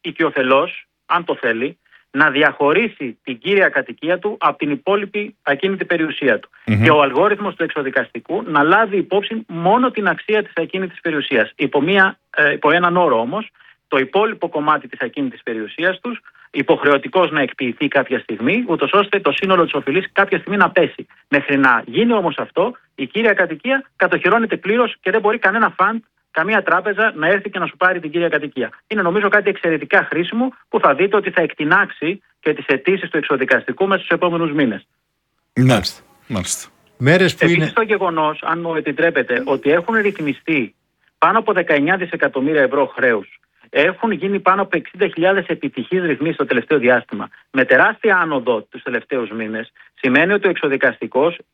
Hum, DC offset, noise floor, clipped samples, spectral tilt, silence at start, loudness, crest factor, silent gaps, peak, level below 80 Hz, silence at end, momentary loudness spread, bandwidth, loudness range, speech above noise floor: none; under 0.1%; -70 dBFS; under 0.1%; -5.5 dB/octave; 0.05 s; -17 LUFS; 18 dB; none; 0 dBFS; -58 dBFS; 0.15 s; 10 LU; 14.5 kHz; 2 LU; 53 dB